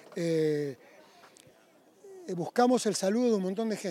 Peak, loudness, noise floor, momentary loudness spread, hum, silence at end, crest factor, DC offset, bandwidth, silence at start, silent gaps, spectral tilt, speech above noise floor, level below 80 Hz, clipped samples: -12 dBFS; -29 LUFS; -61 dBFS; 14 LU; none; 0 s; 18 dB; under 0.1%; 16 kHz; 0.1 s; none; -5 dB/octave; 33 dB; -88 dBFS; under 0.1%